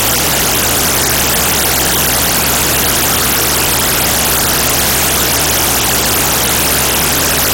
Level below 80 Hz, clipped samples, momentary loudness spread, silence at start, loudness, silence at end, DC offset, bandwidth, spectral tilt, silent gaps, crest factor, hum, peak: -28 dBFS; under 0.1%; 0 LU; 0 s; -10 LUFS; 0 s; under 0.1%; 18 kHz; -1.5 dB/octave; none; 12 dB; none; 0 dBFS